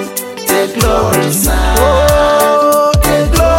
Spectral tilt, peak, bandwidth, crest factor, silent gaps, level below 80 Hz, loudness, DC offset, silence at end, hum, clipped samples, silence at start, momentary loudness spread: -4.5 dB/octave; 0 dBFS; 17.5 kHz; 10 dB; none; -18 dBFS; -11 LUFS; under 0.1%; 0 s; none; under 0.1%; 0 s; 4 LU